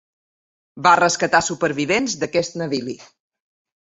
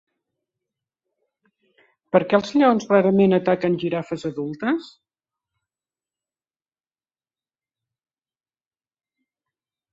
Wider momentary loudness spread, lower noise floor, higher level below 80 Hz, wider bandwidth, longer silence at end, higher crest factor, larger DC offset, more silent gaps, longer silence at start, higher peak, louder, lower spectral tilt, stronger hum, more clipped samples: about the same, 11 LU vs 11 LU; about the same, under -90 dBFS vs under -90 dBFS; first, -58 dBFS vs -66 dBFS; about the same, 8.4 kHz vs 7.8 kHz; second, 0.9 s vs 5.05 s; about the same, 20 dB vs 22 dB; neither; neither; second, 0.75 s vs 2.15 s; about the same, -2 dBFS vs -2 dBFS; about the same, -19 LUFS vs -20 LUFS; second, -3.5 dB/octave vs -7 dB/octave; neither; neither